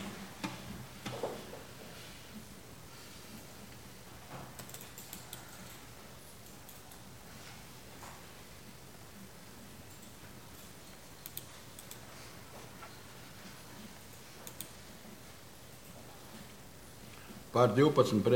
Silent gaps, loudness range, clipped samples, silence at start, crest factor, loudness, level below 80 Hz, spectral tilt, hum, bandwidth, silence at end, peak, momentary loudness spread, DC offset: none; 6 LU; under 0.1%; 0 s; 28 dB; -39 LUFS; -64 dBFS; -5.5 dB/octave; none; 17 kHz; 0 s; -12 dBFS; 10 LU; 0.1%